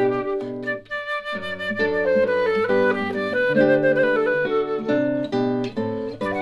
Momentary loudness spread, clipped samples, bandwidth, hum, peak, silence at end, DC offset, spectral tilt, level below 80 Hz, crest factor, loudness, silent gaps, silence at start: 9 LU; under 0.1%; 10.5 kHz; none; -6 dBFS; 0 s; under 0.1%; -7 dB/octave; -56 dBFS; 14 dB; -22 LUFS; none; 0 s